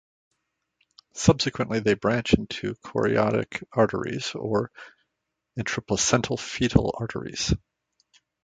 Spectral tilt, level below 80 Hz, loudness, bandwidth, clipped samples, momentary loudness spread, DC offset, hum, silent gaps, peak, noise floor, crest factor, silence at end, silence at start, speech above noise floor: -4.5 dB/octave; -44 dBFS; -25 LUFS; 9.6 kHz; under 0.1%; 10 LU; under 0.1%; none; none; -2 dBFS; -81 dBFS; 24 dB; 0.9 s; 1.15 s; 57 dB